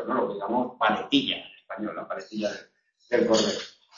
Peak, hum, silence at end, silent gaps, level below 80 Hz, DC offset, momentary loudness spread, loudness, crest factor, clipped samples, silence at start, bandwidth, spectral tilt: -8 dBFS; none; 0.25 s; none; -64 dBFS; under 0.1%; 12 LU; -27 LUFS; 20 dB; under 0.1%; 0 s; 7.4 kHz; -3.5 dB/octave